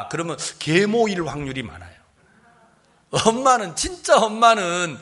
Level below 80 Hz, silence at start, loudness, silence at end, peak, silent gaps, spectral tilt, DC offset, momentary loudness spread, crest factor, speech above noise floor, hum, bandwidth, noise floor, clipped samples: -50 dBFS; 0 s; -20 LUFS; 0 s; -2 dBFS; none; -3.5 dB/octave; under 0.1%; 12 LU; 20 dB; 37 dB; none; 11.5 kHz; -57 dBFS; under 0.1%